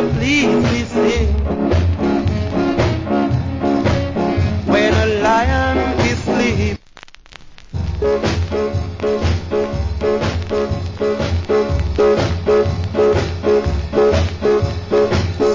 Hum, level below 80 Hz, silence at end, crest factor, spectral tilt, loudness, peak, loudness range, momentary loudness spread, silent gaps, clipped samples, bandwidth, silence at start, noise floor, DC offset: none; -24 dBFS; 0 s; 16 dB; -6.5 dB/octave; -17 LUFS; 0 dBFS; 4 LU; 6 LU; none; under 0.1%; 7.6 kHz; 0 s; -41 dBFS; under 0.1%